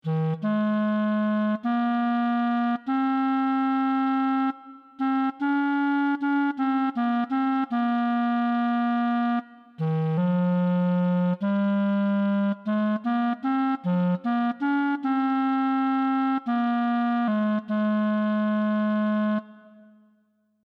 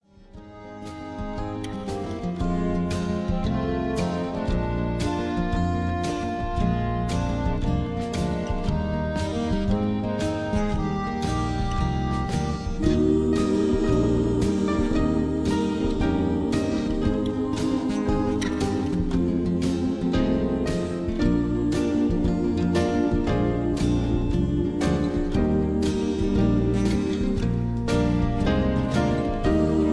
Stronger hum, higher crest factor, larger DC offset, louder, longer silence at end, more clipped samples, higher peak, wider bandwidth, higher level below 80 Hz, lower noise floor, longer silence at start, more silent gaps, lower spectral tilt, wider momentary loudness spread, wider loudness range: neither; second, 10 dB vs 16 dB; neither; about the same, -25 LUFS vs -25 LUFS; first, 1.05 s vs 0 s; neither; second, -14 dBFS vs -8 dBFS; second, 5.2 kHz vs 11 kHz; second, -82 dBFS vs -32 dBFS; first, -67 dBFS vs -45 dBFS; second, 0.05 s vs 0.2 s; neither; first, -9.5 dB/octave vs -7 dB/octave; second, 2 LU vs 5 LU; about the same, 1 LU vs 3 LU